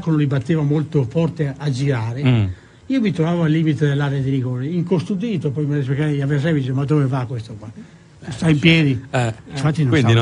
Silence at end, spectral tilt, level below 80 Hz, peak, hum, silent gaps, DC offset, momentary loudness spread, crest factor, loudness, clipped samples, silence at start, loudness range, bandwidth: 0 s; -7.5 dB/octave; -50 dBFS; -2 dBFS; none; none; under 0.1%; 8 LU; 16 dB; -19 LUFS; under 0.1%; 0 s; 2 LU; 10.5 kHz